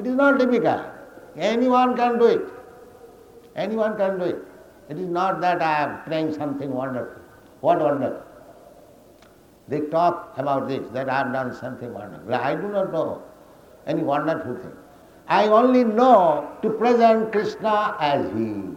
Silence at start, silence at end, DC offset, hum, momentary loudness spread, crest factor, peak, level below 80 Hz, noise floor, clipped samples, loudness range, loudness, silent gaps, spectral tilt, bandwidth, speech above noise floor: 0 s; 0 s; under 0.1%; none; 17 LU; 18 dB; -4 dBFS; -62 dBFS; -51 dBFS; under 0.1%; 8 LU; -22 LUFS; none; -7 dB/octave; 16 kHz; 30 dB